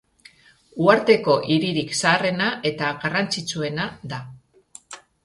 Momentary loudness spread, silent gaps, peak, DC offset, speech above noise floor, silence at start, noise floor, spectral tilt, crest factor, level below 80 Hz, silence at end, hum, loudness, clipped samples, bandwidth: 17 LU; none; -2 dBFS; under 0.1%; 32 dB; 0.75 s; -54 dBFS; -4.5 dB/octave; 22 dB; -60 dBFS; 0.25 s; none; -21 LUFS; under 0.1%; 11.5 kHz